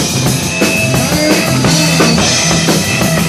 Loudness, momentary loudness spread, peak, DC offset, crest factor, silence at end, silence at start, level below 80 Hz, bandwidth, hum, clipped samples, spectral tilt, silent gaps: -10 LUFS; 3 LU; 0 dBFS; under 0.1%; 12 dB; 0 s; 0 s; -32 dBFS; 15.5 kHz; none; under 0.1%; -3.5 dB/octave; none